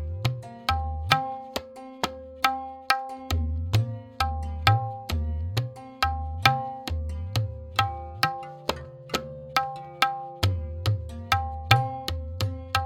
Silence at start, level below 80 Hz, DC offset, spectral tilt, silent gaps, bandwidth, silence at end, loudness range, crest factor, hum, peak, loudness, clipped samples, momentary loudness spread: 0 s; -40 dBFS; under 0.1%; -4.5 dB/octave; none; 17.5 kHz; 0 s; 2 LU; 26 dB; none; 0 dBFS; -28 LUFS; under 0.1%; 10 LU